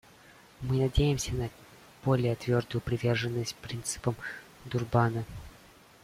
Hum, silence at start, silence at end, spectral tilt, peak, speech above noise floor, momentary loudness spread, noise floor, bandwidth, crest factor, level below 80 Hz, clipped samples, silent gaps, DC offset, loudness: none; 0.6 s; 0.5 s; -5.5 dB/octave; -10 dBFS; 26 dB; 14 LU; -56 dBFS; 15.5 kHz; 20 dB; -44 dBFS; under 0.1%; none; under 0.1%; -31 LUFS